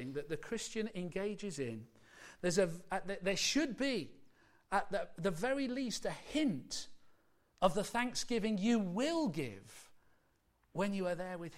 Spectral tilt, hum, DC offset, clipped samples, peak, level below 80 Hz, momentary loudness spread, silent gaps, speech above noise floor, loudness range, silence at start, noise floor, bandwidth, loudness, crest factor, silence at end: -4 dB/octave; none; under 0.1%; under 0.1%; -18 dBFS; -62 dBFS; 11 LU; none; 38 dB; 2 LU; 0 s; -75 dBFS; 16 kHz; -37 LUFS; 20 dB; 0 s